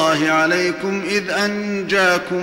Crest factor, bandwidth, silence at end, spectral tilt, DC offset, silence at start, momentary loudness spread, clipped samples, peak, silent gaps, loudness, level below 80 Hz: 12 dB; 16.5 kHz; 0 s; -4 dB/octave; under 0.1%; 0 s; 5 LU; under 0.1%; -6 dBFS; none; -18 LUFS; -56 dBFS